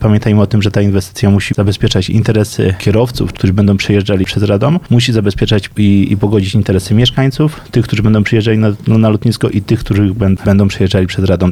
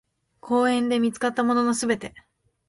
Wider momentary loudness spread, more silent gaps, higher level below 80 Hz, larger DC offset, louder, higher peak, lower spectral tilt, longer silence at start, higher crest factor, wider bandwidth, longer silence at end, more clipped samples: about the same, 3 LU vs 5 LU; neither; first, -32 dBFS vs -64 dBFS; first, 0.8% vs under 0.1%; first, -12 LUFS vs -23 LUFS; first, 0 dBFS vs -8 dBFS; first, -7 dB/octave vs -4 dB/octave; second, 0 s vs 0.45 s; second, 10 dB vs 16 dB; first, 13.5 kHz vs 11.5 kHz; second, 0 s vs 0.5 s; neither